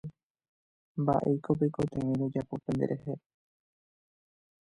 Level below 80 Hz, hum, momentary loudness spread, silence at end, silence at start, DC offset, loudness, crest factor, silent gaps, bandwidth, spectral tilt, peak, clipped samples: -62 dBFS; none; 13 LU; 1.5 s; 0.05 s; under 0.1%; -31 LUFS; 20 dB; 0.25-0.35 s, 0.49-0.95 s; 11 kHz; -9.5 dB/octave; -14 dBFS; under 0.1%